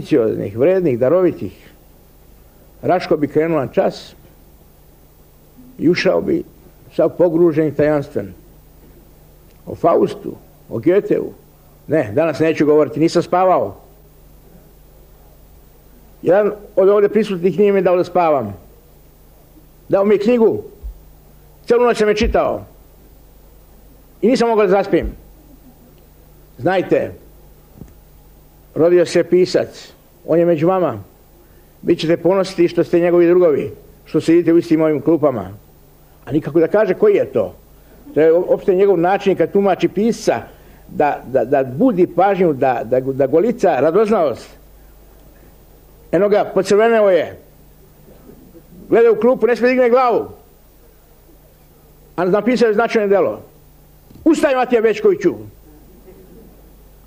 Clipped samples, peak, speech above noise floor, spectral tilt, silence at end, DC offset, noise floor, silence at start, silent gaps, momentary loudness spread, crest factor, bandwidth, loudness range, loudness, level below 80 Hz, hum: under 0.1%; -4 dBFS; 32 dB; -7 dB/octave; 1.6 s; under 0.1%; -47 dBFS; 0 s; none; 13 LU; 14 dB; 15.5 kHz; 5 LU; -15 LUFS; -42 dBFS; none